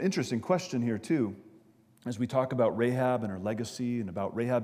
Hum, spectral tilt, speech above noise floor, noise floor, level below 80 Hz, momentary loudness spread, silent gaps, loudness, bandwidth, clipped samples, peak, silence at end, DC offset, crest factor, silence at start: none; -6.5 dB/octave; 30 dB; -60 dBFS; -74 dBFS; 8 LU; none; -31 LUFS; 15.5 kHz; under 0.1%; -14 dBFS; 0 s; under 0.1%; 18 dB; 0 s